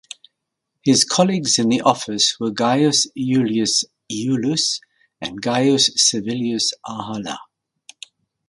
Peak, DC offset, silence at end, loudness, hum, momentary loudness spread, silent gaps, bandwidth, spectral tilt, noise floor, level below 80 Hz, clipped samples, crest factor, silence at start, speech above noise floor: 0 dBFS; under 0.1%; 1.05 s; -18 LUFS; none; 13 LU; none; 11.5 kHz; -3 dB/octave; -79 dBFS; -62 dBFS; under 0.1%; 20 dB; 0.85 s; 60 dB